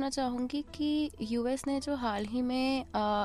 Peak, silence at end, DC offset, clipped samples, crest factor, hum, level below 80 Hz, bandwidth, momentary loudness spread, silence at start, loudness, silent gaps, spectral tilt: -20 dBFS; 0 s; under 0.1%; under 0.1%; 12 dB; none; -54 dBFS; 13 kHz; 3 LU; 0 s; -33 LUFS; none; -4.5 dB/octave